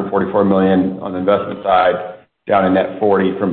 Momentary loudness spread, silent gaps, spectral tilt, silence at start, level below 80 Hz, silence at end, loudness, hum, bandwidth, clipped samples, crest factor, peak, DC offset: 7 LU; none; -12 dB/octave; 0 s; -54 dBFS; 0 s; -15 LUFS; none; 4.4 kHz; under 0.1%; 14 dB; -2 dBFS; under 0.1%